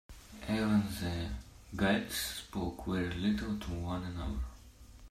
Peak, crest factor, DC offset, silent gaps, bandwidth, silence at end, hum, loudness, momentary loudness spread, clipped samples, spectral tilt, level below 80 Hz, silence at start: -16 dBFS; 18 dB; under 0.1%; none; 15 kHz; 0.05 s; none; -35 LUFS; 14 LU; under 0.1%; -5 dB/octave; -48 dBFS; 0.1 s